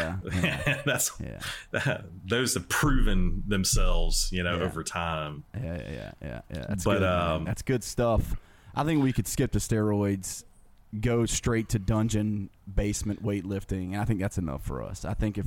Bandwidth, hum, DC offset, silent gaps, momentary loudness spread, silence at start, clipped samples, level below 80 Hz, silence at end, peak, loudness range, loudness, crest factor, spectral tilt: 17 kHz; none; under 0.1%; none; 11 LU; 0 s; under 0.1%; -34 dBFS; 0 s; -14 dBFS; 3 LU; -29 LUFS; 14 dB; -4.5 dB/octave